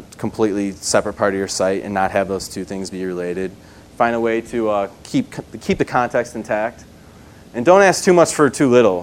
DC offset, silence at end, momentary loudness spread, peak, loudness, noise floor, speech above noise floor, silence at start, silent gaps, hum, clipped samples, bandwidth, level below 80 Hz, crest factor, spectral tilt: under 0.1%; 0 s; 14 LU; 0 dBFS; -18 LUFS; -42 dBFS; 25 dB; 0 s; none; none; under 0.1%; 16 kHz; -48 dBFS; 18 dB; -4.5 dB/octave